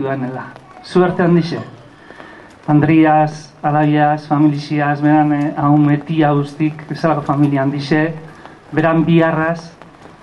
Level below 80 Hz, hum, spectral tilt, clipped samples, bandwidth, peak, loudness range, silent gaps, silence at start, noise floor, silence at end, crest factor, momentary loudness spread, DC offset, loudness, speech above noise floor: -52 dBFS; none; -8.5 dB/octave; under 0.1%; 9.2 kHz; 0 dBFS; 2 LU; none; 0 s; -38 dBFS; 0.55 s; 16 dB; 11 LU; under 0.1%; -15 LUFS; 24 dB